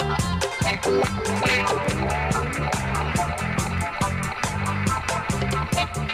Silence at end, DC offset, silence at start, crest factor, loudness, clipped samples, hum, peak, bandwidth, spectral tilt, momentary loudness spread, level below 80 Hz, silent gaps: 0 s; under 0.1%; 0 s; 18 dB; -24 LUFS; under 0.1%; none; -6 dBFS; 16 kHz; -4.5 dB/octave; 4 LU; -36 dBFS; none